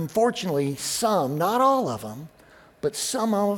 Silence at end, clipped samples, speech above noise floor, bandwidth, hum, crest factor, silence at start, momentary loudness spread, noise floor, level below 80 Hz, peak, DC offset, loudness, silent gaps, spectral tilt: 0 s; under 0.1%; 24 dB; 19 kHz; none; 16 dB; 0 s; 11 LU; -47 dBFS; -62 dBFS; -8 dBFS; under 0.1%; -24 LUFS; none; -4.5 dB/octave